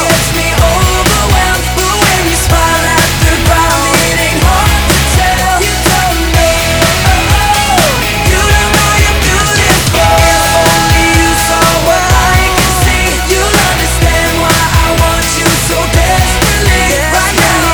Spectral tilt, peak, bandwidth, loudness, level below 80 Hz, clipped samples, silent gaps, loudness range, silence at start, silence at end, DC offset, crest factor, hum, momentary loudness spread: -3.5 dB/octave; 0 dBFS; over 20 kHz; -8 LUFS; -16 dBFS; under 0.1%; none; 1 LU; 0 s; 0 s; under 0.1%; 8 dB; none; 2 LU